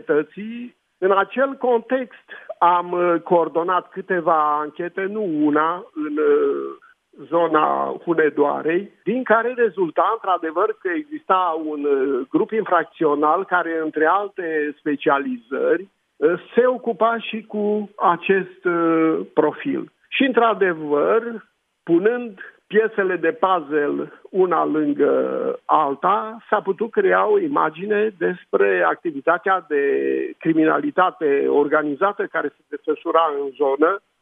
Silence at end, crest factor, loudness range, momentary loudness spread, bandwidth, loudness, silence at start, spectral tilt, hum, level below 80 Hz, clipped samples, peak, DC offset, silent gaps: 0.25 s; 18 dB; 2 LU; 8 LU; 3.8 kHz; -20 LUFS; 0.1 s; -9 dB/octave; none; -78 dBFS; under 0.1%; -2 dBFS; under 0.1%; none